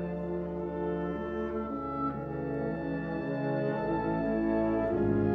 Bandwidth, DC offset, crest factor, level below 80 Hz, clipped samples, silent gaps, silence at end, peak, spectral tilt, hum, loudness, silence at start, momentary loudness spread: 5.2 kHz; under 0.1%; 14 dB; -50 dBFS; under 0.1%; none; 0 s; -16 dBFS; -10.5 dB/octave; none; -32 LUFS; 0 s; 6 LU